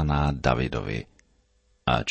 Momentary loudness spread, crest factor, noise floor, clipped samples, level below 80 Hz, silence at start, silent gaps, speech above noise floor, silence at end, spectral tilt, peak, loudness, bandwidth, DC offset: 11 LU; 20 dB; -66 dBFS; under 0.1%; -36 dBFS; 0 s; none; 40 dB; 0 s; -6.5 dB/octave; -6 dBFS; -27 LUFS; 8.6 kHz; under 0.1%